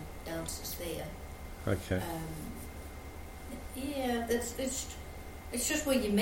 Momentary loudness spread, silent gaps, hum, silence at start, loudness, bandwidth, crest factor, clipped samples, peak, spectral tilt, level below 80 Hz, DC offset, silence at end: 15 LU; none; none; 0 s; -36 LUFS; 16.5 kHz; 20 dB; under 0.1%; -16 dBFS; -4 dB/octave; -48 dBFS; under 0.1%; 0 s